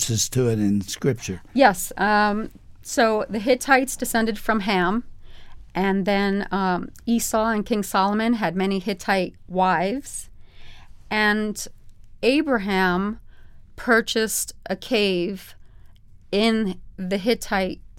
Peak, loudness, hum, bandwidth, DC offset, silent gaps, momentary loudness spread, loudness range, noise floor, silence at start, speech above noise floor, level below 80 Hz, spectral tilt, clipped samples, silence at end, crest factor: -2 dBFS; -22 LUFS; none; 17 kHz; under 0.1%; none; 11 LU; 3 LU; -46 dBFS; 0 s; 24 dB; -44 dBFS; -4 dB/octave; under 0.1%; 0 s; 22 dB